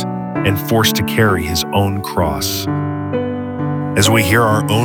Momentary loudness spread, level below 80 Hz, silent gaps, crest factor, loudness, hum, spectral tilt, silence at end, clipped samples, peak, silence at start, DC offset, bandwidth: 8 LU; -38 dBFS; none; 16 dB; -16 LUFS; none; -4.5 dB/octave; 0 s; under 0.1%; 0 dBFS; 0 s; under 0.1%; 19.5 kHz